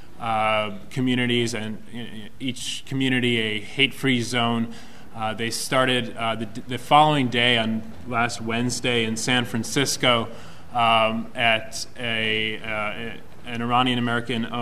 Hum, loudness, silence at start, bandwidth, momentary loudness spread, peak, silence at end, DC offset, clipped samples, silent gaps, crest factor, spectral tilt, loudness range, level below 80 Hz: none; -23 LUFS; 0.15 s; 15.5 kHz; 13 LU; -2 dBFS; 0 s; 2%; under 0.1%; none; 22 dB; -4 dB/octave; 3 LU; -54 dBFS